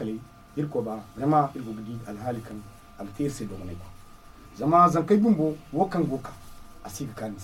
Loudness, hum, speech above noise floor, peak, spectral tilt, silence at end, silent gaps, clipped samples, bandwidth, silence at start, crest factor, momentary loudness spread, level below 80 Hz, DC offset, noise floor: -26 LUFS; none; 22 dB; -6 dBFS; -7.5 dB/octave; 0 s; none; under 0.1%; 16.5 kHz; 0 s; 22 dB; 21 LU; -52 dBFS; under 0.1%; -48 dBFS